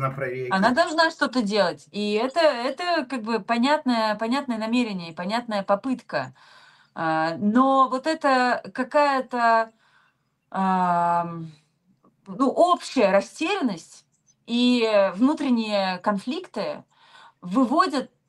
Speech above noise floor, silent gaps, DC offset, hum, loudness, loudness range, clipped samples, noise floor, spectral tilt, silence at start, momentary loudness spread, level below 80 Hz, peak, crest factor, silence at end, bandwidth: 45 dB; none; under 0.1%; none; -23 LUFS; 3 LU; under 0.1%; -67 dBFS; -5 dB/octave; 0 s; 10 LU; -70 dBFS; -6 dBFS; 18 dB; 0.25 s; 12 kHz